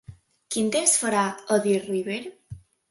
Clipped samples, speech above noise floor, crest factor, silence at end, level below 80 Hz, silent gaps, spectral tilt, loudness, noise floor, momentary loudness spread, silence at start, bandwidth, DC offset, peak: under 0.1%; 21 dB; 20 dB; 0.3 s; -60 dBFS; none; -3 dB/octave; -24 LUFS; -45 dBFS; 12 LU; 0.1 s; 12 kHz; under 0.1%; -6 dBFS